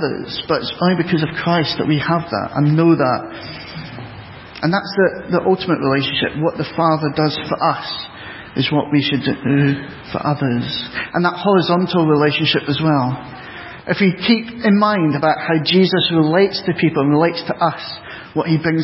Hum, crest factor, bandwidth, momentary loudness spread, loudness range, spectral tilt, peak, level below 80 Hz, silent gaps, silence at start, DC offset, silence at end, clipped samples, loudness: none; 16 dB; 5.8 kHz; 14 LU; 4 LU; -10.5 dB/octave; -2 dBFS; -50 dBFS; none; 0 s; under 0.1%; 0 s; under 0.1%; -17 LUFS